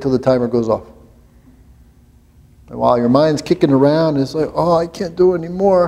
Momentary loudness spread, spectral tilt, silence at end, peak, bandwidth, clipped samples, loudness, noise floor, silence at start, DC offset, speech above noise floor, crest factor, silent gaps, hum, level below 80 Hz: 7 LU; -7.5 dB/octave; 0 s; 0 dBFS; 12.5 kHz; under 0.1%; -15 LUFS; -48 dBFS; 0 s; under 0.1%; 33 dB; 16 dB; none; none; -46 dBFS